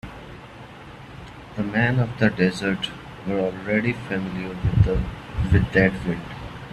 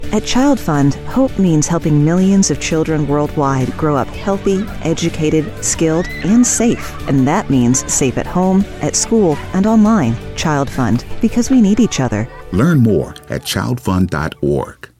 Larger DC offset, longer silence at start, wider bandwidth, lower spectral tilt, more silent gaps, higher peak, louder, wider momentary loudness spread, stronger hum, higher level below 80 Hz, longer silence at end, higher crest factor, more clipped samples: neither; about the same, 0.05 s vs 0 s; second, 12 kHz vs 15.5 kHz; first, -7.5 dB/octave vs -5.5 dB/octave; neither; about the same, -2 dBFS vs -2 dBFS; second, -23 LUFS vs -15 LUFS; first, 21 LU vs 7 LU; neither; about the same, -36 dBFS vs -32 dBFS; second, 0 s vs 0.25 s; first, 22 dB vs 12 dB; neither